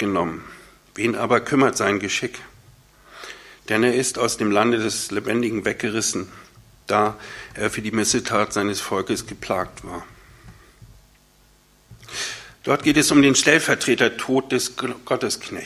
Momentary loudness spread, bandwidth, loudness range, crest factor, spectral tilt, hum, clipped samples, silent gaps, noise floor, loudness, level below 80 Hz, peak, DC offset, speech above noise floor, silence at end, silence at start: 19 LU; 15 kHz; 10 LU; 22 dB; -3.5 dB/octave; none; under 0.1%; none; -56 dBFS; -21 LUFS; -52 dBFS; 0 dBFS; under 0.1%; 35 dB; 0 s; 0 s